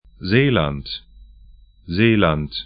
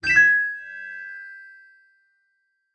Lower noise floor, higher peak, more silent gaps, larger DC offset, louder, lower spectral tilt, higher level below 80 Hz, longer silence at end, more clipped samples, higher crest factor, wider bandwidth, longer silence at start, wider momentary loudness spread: second, -47 dBFS vs -72 dBFS; first, 0 dBFS vs -6 dBFS; neither; neither; about the same, -18 LUFS vs -18 LUFS; first, -11.5 dB/octave vs -1.5 dB/octave; first, -40 dBFS vs -60 dBFS; second, 0 s vs 1.35 s; neither; about the same, 20 dB vs 18 dB; second, 5.2 kHz vs 10.5 kHz; first, 0.2 s vs 0.05 s; second, 14 LU vs 25 LU